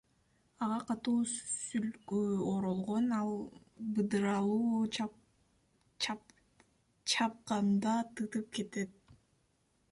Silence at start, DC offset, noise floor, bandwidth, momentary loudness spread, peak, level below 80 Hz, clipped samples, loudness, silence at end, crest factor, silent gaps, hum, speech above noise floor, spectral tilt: 0.6 s; under 0.1%; -75 dBFS; 11.5 kHz; 9 LU; -20 dBFS; -72 dBFS; under 0.1%; -35 LUFS; 0.8 s; 16 dB; none; none; 40 dB; -4.5 dB/octave